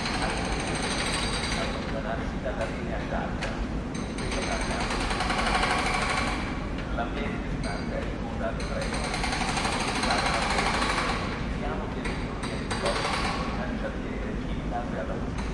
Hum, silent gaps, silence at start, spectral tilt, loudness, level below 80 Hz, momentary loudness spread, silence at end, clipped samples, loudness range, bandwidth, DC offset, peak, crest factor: none; none; 0 s; -4.5 dB/octave; -29 LUFS; -36 dBFS; 7 LU; 0 s; under 0.1%; 4 LU; 11.5 kHz; under 0.1%; -10 dBFS; 18 dB